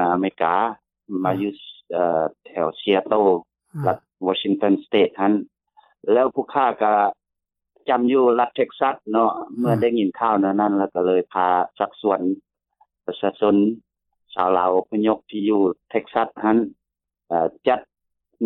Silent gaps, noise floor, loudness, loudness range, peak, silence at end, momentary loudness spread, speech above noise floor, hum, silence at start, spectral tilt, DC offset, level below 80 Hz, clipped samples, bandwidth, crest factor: none; -82 dBFS; -21 LUFS; 2 LU; -4 dBFS; 0 s; 8 LU; 62 dB; none; 0 s; -8.5 dB/octave; under 0.1%; -68 dBFS; under 0.1%; 4.1 kHz; 18 dB